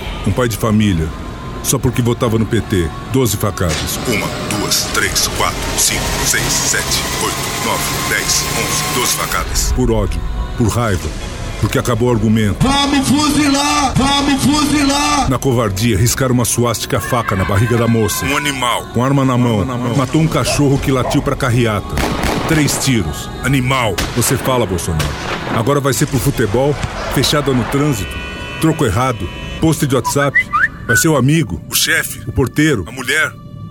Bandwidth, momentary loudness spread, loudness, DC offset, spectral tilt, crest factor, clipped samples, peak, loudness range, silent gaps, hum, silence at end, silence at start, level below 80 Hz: 19.5 kHz; 6 LU; -15 LUFS; under 0.1%; -4 dB/octave; 14 dB; under 0.1%; 0 dBFS; 3 LU; none; none; 0 s; 0 s; -28 dBFS